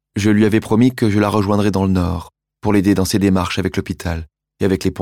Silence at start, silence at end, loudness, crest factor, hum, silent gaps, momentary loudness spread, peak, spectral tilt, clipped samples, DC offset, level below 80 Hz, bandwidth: 0.15 s; 0 s; -17 LUFS; 14 dB; none; none; 10 LU; -2 dBFS; -6.5 dB/octave; under 0.1%; under 0.1%; -42 dBFS; 16 kHz